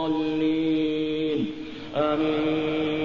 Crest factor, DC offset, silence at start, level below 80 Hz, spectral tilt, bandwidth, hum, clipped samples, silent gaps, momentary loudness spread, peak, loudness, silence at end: 12 dB; 0.4%; 0 s; -54 dBFS; -7.5 dB/octave; 6.8 kHz; none; under 0.1%; none; 6 LU; -12 dBFS; -25 LUFS; 0 s